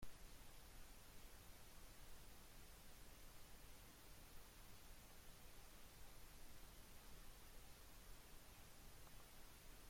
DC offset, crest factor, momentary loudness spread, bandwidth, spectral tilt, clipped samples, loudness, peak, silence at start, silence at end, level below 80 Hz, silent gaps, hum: under 0.1%; 16 dB; 0 LU; 16.5 kHz; -3 dB/octave; under 0.1%; -64 LUFS; -42 dBFS; 0 s; 0 s; -64 dBFS; none; none